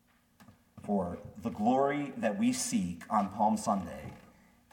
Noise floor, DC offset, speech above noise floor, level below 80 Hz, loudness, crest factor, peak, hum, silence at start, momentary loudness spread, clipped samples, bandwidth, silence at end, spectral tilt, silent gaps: -61 dBFS; under 0.1%; 30 dB; -64 dBFS; -32 LUFS; 18 dB; -16 dBFS; none; 0.4 s; 13 LU; under 0.1%; 17.5 kHz; 0.5 s; -5 dB/octave; none